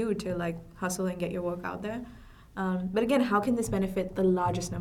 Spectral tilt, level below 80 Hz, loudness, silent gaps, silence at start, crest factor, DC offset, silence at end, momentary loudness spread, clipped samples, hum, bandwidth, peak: -6 dB/octave; -52 dBFS; -30 LUFS; none; 0 s; 18 dB; under 0.1%; 0 s; 10 LU; under 0.1%; none; 16 kHz; -12 dBFS